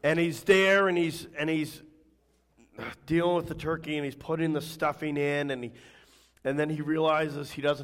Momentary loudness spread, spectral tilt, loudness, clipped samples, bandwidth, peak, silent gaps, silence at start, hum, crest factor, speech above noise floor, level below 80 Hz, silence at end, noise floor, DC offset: 14 LU; -5.5 dB/octave; -28 LUFS; under 0.1%; 16 kHz; -10 dBFS; none; 0.05 s; none; 18 dB; 39 dB; -60 dBFS; 0 s; -67 dBFS; under 0.1%